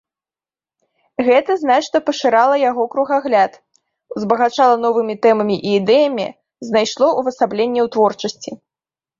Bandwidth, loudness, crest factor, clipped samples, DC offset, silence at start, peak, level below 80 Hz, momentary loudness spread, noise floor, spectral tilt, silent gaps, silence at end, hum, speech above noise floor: 7.6 kHz; -16 LUFS; 16 dB; under 0.1%; under 0.1%; 1.2 s; -2 dBFS; -64 dBFS; 12 LU; under -90 dBFS; -4.5 dB/octave; none; 0.65 s; none; over 75 dB